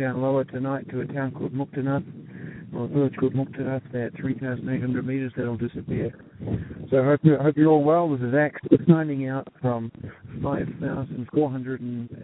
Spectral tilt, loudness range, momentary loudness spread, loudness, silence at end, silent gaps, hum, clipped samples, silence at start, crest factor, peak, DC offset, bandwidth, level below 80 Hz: -13 dB/octave; 7 LU; 13 LU; -25 LUFS; 0 s; none; none; under 0.1%; 0 s; 22 dB; -2 dBFS; under 0.1%; 4 kHz; -54 dBFS